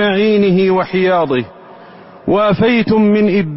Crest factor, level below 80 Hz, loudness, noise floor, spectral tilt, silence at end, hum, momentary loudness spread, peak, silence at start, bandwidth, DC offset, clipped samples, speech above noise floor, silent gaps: 10 dB; -46 dBFS; -13 LUFS; -37 dBFS; -11 dB/octave; 0 s; none; 7 LU; -2 dBFS; 0 s; 5.8 kHz; under 0.1%; under 0.1%; 25 dB; none